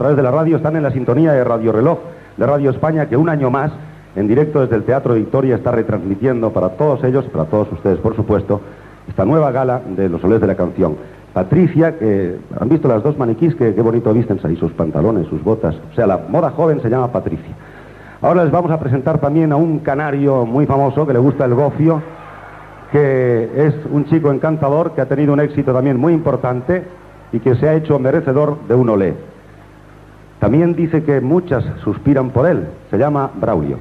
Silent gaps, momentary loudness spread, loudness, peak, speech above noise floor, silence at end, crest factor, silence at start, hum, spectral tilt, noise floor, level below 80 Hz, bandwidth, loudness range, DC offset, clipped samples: none; 7 LU; -15 LUFS; 0 dBFS; 26 dB; 0 s; 14 dB; 0 s; none; -10.5 dB/octave; -40 dBFS; -42 dBFS; 5.4 kHz; 2 LU; under 0.1%; under 0.1%